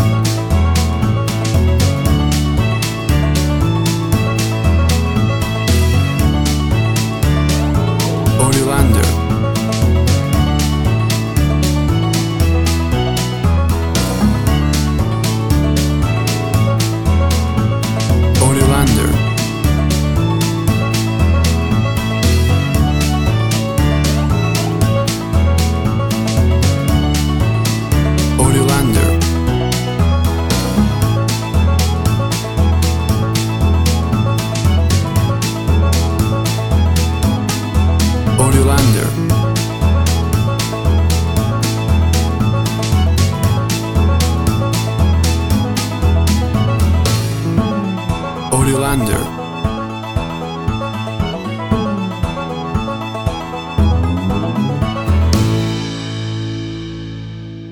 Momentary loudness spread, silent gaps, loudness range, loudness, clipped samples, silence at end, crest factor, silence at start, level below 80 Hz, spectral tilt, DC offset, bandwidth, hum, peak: 7 LU; none; 4 LU; -15 LUFS; under 0.1%; 0 s; 14 dB; 0 s; -20 dBFS; -5.5 dB/octave; under 0.1%; 17.5 kHz; none; 0 dBFS